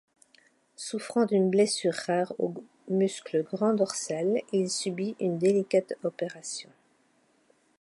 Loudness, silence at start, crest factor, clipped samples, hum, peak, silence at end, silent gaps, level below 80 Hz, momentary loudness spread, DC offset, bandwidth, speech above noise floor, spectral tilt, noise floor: -28 LUFS; 0.8 s; 16 dB; under 0.1%; none; -12 dBFS; 1.2 s; none; -80 dBFS; 12 LU; under 0.1%; 11.5 kHz; 40 dB; -5 dB/octave; -67 dBFS